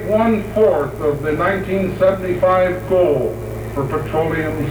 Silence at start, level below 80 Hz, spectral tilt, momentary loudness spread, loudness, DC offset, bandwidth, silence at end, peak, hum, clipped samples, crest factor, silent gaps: 0 s; -36 dBFS; -7.5 dB/octave; 6 LU; -17 LUFS; under 0.1%; over 20 kHz; 0 s; -4 dBFS; none; under 0.1%; 12 dB; none